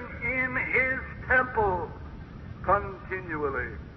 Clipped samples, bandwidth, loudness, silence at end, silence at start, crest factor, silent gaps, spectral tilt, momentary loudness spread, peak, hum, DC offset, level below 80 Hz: under 0.1%; 6.2 kHz; -27 LUFS; 0 s; 0 s; 18 dB; none; -8.5 dB/octave; 17 LU; -12 dBFS; none; under 0.1%; -44 dBFS